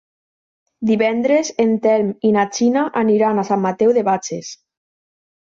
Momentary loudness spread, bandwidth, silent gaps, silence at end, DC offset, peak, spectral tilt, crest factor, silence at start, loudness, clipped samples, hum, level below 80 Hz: 7 LU; 7.6 kHz; none; 1.05 s; under 0.1%; -4 dBFS; -5.5 dB/octave; 14 dB; 0.8 s; -17 LUFS; under 0.1%; none; -64 dBFS